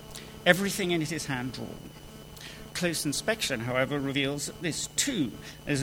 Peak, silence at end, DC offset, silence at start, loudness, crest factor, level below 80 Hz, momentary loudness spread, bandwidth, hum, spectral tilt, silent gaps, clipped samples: -4 dBFS; 0 s; under 0.1%; 0 s; -29 LUFS; 26 dB; -54 dBFS; 18 LU; 19 kHz; none; -3.5 dB/octave; none; under 0.1%